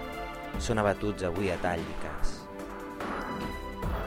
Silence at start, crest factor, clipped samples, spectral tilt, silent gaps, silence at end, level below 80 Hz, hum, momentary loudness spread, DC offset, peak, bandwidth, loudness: 0 s; 20 dB; under 0.1%; -5.5 dB/octave; none; 0 s; -40 dBFS; none; 12 LU; under 0.1%; -12 dBFS; 16 kHz; -33 LUFS